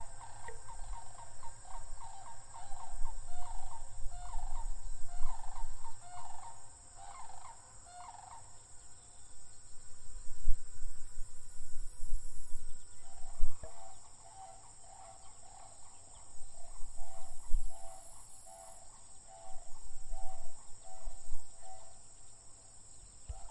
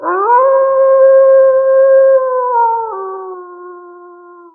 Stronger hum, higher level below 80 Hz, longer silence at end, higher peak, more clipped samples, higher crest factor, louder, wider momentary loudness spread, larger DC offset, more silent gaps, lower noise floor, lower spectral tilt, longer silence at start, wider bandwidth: neither; first, -42 dBFS vs -86 dBFS; second, 0 s vs 0.6 s; second, -10 dBFS vs 0 dBFS; neither; first, 20 dB vs 10 dB; second, -51 LUFS vs -9 LUFS; second, 9 LU vs 17 LU; neither; neither; first, -52 dBFS vs -37 dBFS; second, -3.5 dB/octave vs -8.5 dB/octave; about the same, 0 s vs 0 s; first, 11 kHz vs 2.3 kHz